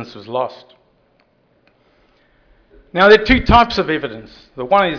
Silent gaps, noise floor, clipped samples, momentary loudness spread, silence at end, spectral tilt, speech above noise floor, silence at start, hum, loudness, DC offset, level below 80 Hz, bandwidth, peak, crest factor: none; -58 dBFS; under 0.1%; 18 LU; 0 s; -6 dB/octave; 43 dB; 0 s; none; -14 LUFS; under 0.1%; -32 dBFS; 5.4 kHz; 0 dBFS; 16 dB